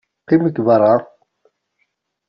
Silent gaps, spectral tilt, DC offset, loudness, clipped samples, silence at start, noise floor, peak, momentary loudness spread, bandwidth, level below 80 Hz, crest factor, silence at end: none; -8 dB/octave; under 0.1%; -15 LUFS; under 0.1%; 0.3 s; -69 dBFS; -2 dBFS; 5 LU; 5.8 kHz; -62 dBFS; 16 dB; 1.25 s